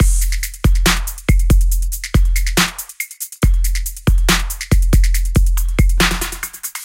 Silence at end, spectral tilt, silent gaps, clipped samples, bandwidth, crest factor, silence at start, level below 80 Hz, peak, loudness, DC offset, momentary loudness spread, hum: 0 s; -4 dB/octave; none; under 0.1%; 16.5 kHz; 14 dB; 0 s; -16 dBFS; 0 dBFS; -17 LUFS; under 0.1%; 8 LU; none